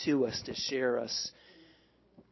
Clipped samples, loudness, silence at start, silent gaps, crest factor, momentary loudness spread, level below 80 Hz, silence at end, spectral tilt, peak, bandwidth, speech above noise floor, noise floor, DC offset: under 0.1%; -33 LUFS; 0 s; none; 16 dB; 5 LU; -66 dBFS; 0.7 s; -3.5 dB/octave; -18 dBFS; 6.2 kHz; 32 dB; -65 dBFS; under 0.1%